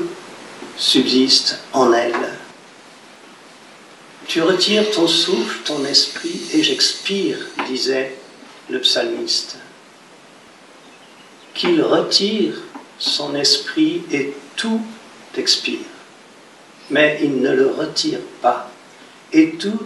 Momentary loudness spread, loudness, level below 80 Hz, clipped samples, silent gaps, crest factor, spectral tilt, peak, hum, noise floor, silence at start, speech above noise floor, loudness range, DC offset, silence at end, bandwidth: 15 LU; -17 LUFS; -72 dBFS; under 0.1%; none; 20 dB; -2.5 dB/octave; 0 dBFS; none; -44 dBFS; 0 s; 27 dB; 5 LU; under 0.1%; 0 s; 12 kHz